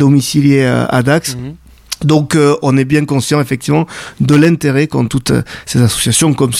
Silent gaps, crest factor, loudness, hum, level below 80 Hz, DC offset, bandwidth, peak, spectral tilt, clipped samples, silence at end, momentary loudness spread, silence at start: none; 12 dB; -12 LUFS; none; -40 dBFS; under 0.1%; 15.5 kHz; 0 dBFS; -5.5 dB/octave; under 0.1%; 0 s; 8 LU; 0 s